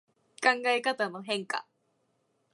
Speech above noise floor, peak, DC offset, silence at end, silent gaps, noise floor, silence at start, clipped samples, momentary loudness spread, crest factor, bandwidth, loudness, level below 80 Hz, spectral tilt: 45 dB; -8 dBFS; under 0.1%; 0.9 s; none; -74 dBFS; 0.4 s; under 0.1%; 10 LU; 24 dB; 11.5 kHz; -29 LUFS; -88 dBFS; -2.5 dB/octave